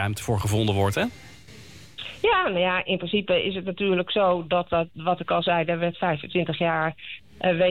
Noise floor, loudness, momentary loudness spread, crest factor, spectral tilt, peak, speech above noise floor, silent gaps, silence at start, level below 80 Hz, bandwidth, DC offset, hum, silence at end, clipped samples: -46 dBFS; -24 LUFS; 7 LU; 12 dB; -5.5 dB/octave; -12 dBFS; 22 dB; none; 0 s; -52 dBFS; 16.5 kHz; 0.3%; none; 0 s; under 0.1%